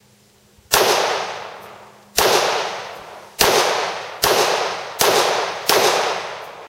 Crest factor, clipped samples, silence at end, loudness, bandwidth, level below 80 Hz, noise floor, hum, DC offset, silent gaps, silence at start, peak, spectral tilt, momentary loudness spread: 20 dB; under 0.1%; 0 s; -17 LUFS; 16 kHz; -50 dBFS; -53 dBFS; none; under 0.1%; none; 0.7 s; 0 dBFS; -1 dB/octave; 16 LU